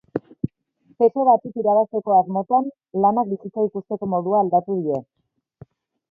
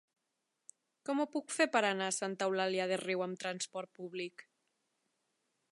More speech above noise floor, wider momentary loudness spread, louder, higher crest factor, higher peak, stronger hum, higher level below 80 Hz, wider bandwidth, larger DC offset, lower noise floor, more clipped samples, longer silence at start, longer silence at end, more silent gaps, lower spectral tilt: second, 41 dB vs 50 dB; about the same, 11 LU vs 13 LU; first, -21 LUFS vs -36 LUFS; second, 16 dB vs 22 dB; first, -4 dBFS vs -16 dBFS; neither; first, -62 dBFS vs under -90 dBFS; second, 3 kHz vs 11.5 kHz; neither; second, -60 dBFS vs -85 dBFS; neither; second, 0.15 s vs 1.05 s; second, 1.1 s vs 1.3 s; neither; first, -12.5 dB/octave vs -3 dB/octave